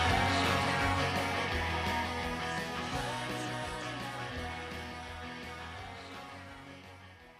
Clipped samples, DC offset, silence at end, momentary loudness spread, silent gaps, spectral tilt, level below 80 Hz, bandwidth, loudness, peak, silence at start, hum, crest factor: under 0.1%; under 0.1%; 0 s; 18 LU; none; -4.5 dB/octave; -52 dBFS; 15 kHz; -34 LUFS; -16 dBFS; 0 s; none; 18 dB